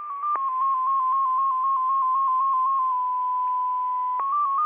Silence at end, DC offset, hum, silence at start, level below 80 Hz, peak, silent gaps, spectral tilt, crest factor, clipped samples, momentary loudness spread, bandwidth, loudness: 0 s; under 0.1%; none; 0 s; -78 dBFS; -16 dBFS; none; 0.5 dB/octave; 6 dB; under 0.1%; 4 LU; 3.5 kHz; -23 LUFS